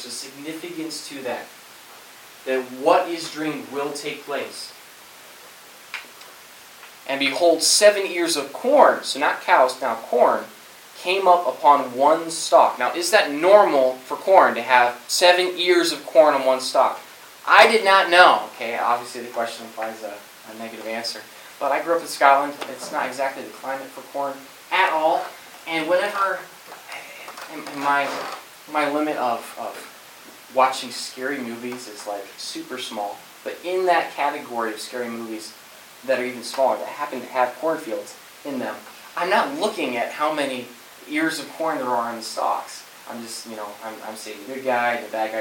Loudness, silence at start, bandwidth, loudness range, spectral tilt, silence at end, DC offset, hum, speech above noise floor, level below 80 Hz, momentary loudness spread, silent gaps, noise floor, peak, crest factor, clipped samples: -21 LUFS; 0 s; 17.5 kHz; 10 LU; -2 dB/octave; 0 s; under 0.1%; none; 24 dB; -76 dBFS; 20 LU; none; -45 dBFS; 0 dBFS; 22 dB; under 0.1%